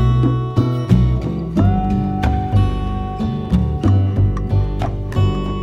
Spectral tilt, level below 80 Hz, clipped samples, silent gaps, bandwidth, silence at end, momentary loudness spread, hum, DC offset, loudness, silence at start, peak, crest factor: -9 dB/octave; -24 dBFS; under 0.1%; none; 7.2 kHz; 0 s; 7 LU; none; 0.2%; -18 LUFS; 0 s; 0 dBFS; 16 dB